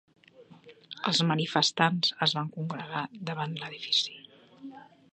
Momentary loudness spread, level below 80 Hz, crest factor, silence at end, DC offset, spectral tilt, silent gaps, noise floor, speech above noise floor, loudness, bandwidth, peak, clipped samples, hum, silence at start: 22 LU; -76 dBFS; 26 dB; 0.3 s; under 0.1%; -4 dB/octave; none; -55 dBFS; 26 dB; -28 LUFS; 9.4 kHz; -6 dBFS; under 0.1%; none; 0.4 s